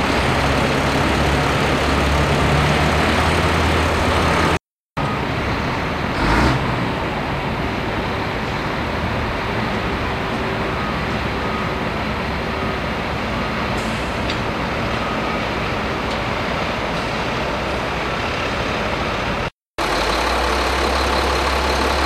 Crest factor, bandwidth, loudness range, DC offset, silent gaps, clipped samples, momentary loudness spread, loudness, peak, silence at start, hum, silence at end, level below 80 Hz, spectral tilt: 16 dB; 15.5 kHz; 5 LU; under 0.1%; 4.75-4.79 s, 4.86-4.96 s, 19.62-19.74 s; under 0.1%; 6 LU; -20 LUFS; -2 dBFS; 0 s; none; 0 s; -30 dBFS; -5 dB/octave